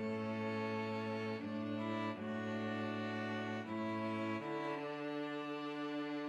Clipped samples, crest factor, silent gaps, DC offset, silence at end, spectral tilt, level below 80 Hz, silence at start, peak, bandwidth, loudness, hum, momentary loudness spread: under 0.1%; 12 dB; none; under 0.1%; 0 s; -7 dB/octave; -86 dBFS; 0 s; -28 dBFS; 10.5 kHz; -41 LUFS; none; 2 LU